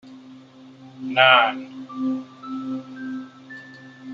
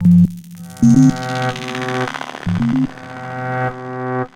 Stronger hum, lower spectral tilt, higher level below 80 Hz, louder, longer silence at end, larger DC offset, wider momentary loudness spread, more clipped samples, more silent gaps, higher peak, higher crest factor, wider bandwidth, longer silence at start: neither; second, -5 dB/octave vs -7 dB/octave; second, -74 dBFS vs -44 dBFS; second, -20 LUFS vs -17 LUFS; about the same, 0 s vs 0.1 s; neither; first, 26 LU vs 14 LU; neither; neither; about the same, -2 dBFS vs -2 dBFS; first, 22 dB vs 16 dB; second, 7.2 kHz vs 11 kHz; about the same, 0.05 s vs 0 s